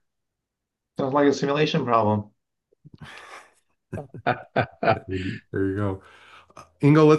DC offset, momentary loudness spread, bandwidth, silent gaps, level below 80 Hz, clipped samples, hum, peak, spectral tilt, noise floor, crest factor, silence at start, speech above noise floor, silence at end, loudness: under 0.1%; 21 LU; 10 kHz; none; -64 dBFS; under 0.1%; none; -6 dBFS; -7 dB/octave; -84 dBFS; 20 dB; 1 s; 61 dB; 0 s; -24 LUFS